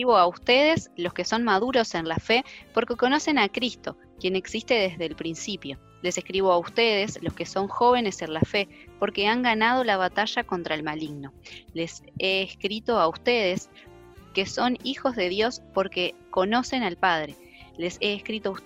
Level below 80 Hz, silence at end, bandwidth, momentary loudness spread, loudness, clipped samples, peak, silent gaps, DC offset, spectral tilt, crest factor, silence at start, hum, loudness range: -56 dBFS; 0.05 s; 16 kHz; 12 LU; -25 LUFS; under 0.1%; -6 dBFS; none; under 0.1%; -4 dB/octave; 20 dB; 0 s; none; 3 LU